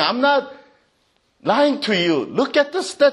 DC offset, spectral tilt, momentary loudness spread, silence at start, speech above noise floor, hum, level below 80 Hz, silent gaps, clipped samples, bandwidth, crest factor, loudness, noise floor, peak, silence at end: under 0.1%; -4.5 dB/octave; 5 LU; 0 s; 46 dB; none; -68 dBFS; none; under 0.1%; 11.5 kHz; 16 dB; -19 LUFS; -64 dBFS; -2 dBFS; 0 s